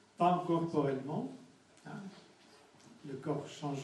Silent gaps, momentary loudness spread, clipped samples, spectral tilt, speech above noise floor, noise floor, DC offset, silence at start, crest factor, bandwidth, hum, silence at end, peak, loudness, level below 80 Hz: none; 21 LU; under 0.1%; -7 dB/octave; 25 dB; -62 dBFS; under 0.1%; 0.2 s; 20 dB; 11.5 kHz; none; 0 s; -18 dBFS; -35 LUFS; -80 dBFS